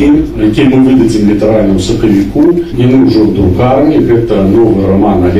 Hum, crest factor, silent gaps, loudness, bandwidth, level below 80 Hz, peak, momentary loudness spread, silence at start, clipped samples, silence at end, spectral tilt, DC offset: none; 6 dB; none; -8 LUFS; 12.5 kHz; -24 dBFS; 0 dBFS; 3 LU; 0 s; under 0.1%; 0 s; -8 dB/octave; under 0.1%